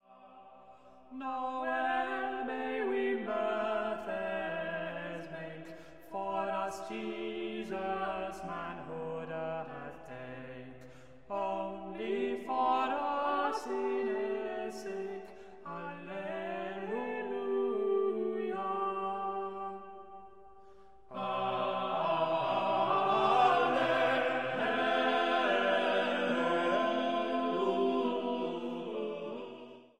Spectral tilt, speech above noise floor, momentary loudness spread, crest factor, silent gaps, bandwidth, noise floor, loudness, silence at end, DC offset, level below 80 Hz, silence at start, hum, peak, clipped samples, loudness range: -5.5 dB/octave; 23 dB; 15 LU; 20 dB; none; 12 kHz; -59 dBFS; -34 LUFS; 0 s; 0.2%; -70 dBFS; 0 s; none; -14 dBFS; under 0.1%; 10 LU